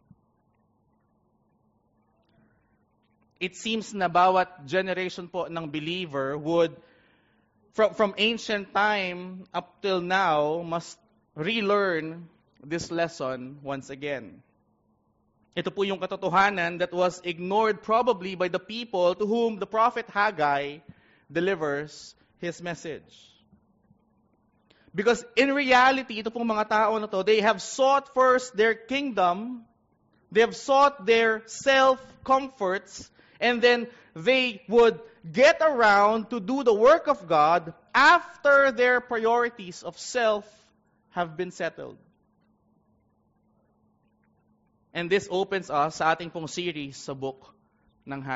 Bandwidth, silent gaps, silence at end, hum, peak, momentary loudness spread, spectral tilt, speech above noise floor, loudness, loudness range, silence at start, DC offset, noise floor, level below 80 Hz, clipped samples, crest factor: 8 kHz; none; 0 s; none; -8 dBFS; 16 LU; -2 dB/octave; 44 dB; -25 LUFS; 12 LU; 3.4 s; under 0.1%; -69 dBFS; -66 dBFS; under 0.1%; 18 dB